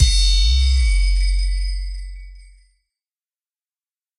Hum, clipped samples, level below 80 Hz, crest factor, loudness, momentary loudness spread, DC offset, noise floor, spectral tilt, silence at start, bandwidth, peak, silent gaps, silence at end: none; under 0.1%; -20 dBFS; 18 dB; -19 LUFS; 18 LU; under 0.1%; under -90 dBFS; -1.5 dB/octave; 0 s; 11 kHz; 0 dBFS; none; 1.75 s